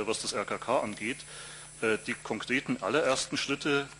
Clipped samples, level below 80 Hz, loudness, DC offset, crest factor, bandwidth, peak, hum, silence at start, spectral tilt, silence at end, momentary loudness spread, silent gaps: under 0.1%; -64 dBFS; -31 LUFS; under 0.1%; 20 dB; 11.5 kHz; -12 dBFS; none; 0 s; -3 dB/octave; 0 s; 10 LU; none